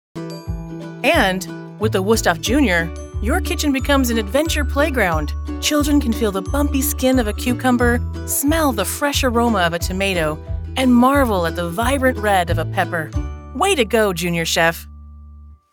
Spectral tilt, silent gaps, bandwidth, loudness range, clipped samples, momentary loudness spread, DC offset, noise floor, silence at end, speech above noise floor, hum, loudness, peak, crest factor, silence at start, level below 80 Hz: -4.5 dB/octave; none; 19.5 kHz; 1 LU; under 0.1%; 10 LU; under 0.1%; -41 dBFS; 0.15 s; 23 dB; none; -18 LUFS; 0 dBFS; 18 dB; 0.15 s; -30 dBFS